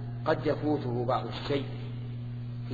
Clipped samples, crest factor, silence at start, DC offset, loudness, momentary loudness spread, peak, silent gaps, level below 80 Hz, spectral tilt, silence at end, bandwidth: under 0.1%; 20 dB; 0 s; under 0.1%; -32 LUFS; 9 LU; -12 dBFS; none; -52 dBFS; -8.5 dB/octave; 0 s; 7.2 kHz